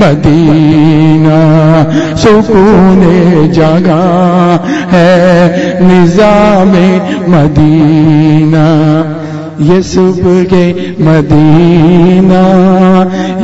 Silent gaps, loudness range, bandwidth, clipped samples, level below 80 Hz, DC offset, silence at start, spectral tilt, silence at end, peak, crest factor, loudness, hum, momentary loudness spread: none; 2 LU; 8 kHz; 6%; -28 dBFS; under 0.1%; 0 s; -8 dB/octave; 0 s; 0 dBFS; 4 dB; -6 LUFS; none; 4 LU